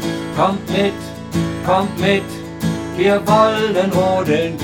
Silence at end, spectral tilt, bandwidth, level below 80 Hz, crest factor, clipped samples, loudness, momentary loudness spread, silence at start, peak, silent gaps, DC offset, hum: 0 s; -6 dB/octave; 18.5 kHz; -44 dBFS; 16 dB; under 0.1%; -17 LUFS; 9 LU; 0 s; 0 dBFS; none; under 0.1%; none